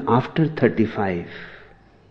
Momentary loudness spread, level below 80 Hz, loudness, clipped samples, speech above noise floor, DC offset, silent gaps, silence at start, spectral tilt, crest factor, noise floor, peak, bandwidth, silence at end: 18 LU; -54 dBFS; -21 LUFS; under 0.1%; 28 dB; under 0.1%; none; 0 s; -9 dB/octave; 20 dB; -49 dBFS; -2 dBFS; 6.4 kHz; 0.45 s